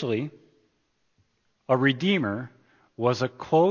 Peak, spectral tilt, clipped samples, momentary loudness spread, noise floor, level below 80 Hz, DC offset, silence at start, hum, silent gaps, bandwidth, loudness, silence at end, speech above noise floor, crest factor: -8 dBFS; -6.5 dB/octave; under 0.1%; 13 LU; -72 dBFS; -66 dBFS; under 0.1%; 0 s; none; none; 7.2 kHz; -25 LUFS; 0 s; 48 dB; 18 dB